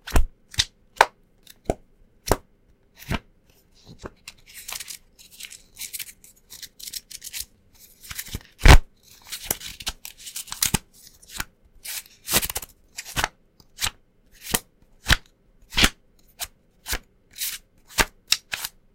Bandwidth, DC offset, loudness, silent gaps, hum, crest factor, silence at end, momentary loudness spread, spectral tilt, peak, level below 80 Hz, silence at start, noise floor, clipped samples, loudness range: 17 kHz; under 0.1%; -25 LUFS; none; none; 26 dB; 0.25 s; 19 LU; -2.5 dB/octave; 0 dBFS; -30 dBFS; 0.05 s; -59 dBFS; under 0.1%; 13 LU